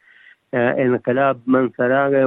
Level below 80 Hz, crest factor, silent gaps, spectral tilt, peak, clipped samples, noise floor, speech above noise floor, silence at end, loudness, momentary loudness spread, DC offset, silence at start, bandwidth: -68 dBFS; 14 dB; none; -10.5 dB/octave; -4 dBFS; under 0.1%; -50 dBFS; 33 dB; 0 s; -18 LUFS; 3 LU; under 0.1%; 0.55 s; 3.9 kHz